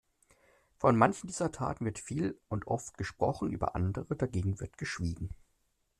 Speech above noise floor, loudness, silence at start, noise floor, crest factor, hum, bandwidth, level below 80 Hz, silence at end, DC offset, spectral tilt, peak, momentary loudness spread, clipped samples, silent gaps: 43 dB; -33 LUFS; 0.8 s; -76 dBFS; 24 dB; none; 12.5 kHz; -54 dBFS; 0.65 s; under 0.1%; -6.5 dB/octave; -10 dBFS; 11 LU; under 0.1%; none